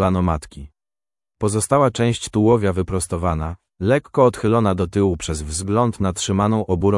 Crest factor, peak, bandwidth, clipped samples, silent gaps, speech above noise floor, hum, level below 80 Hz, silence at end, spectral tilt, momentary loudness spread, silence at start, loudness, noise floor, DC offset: 16 dB; -2 dBFS; 12 kHz; under 0.1%; none; over 71 dB; none; -40 dBFS; 0 s; -6 dB/octave; 9 LU; 0 s; -19 LUFS; under -90 dBFS; under 0.1%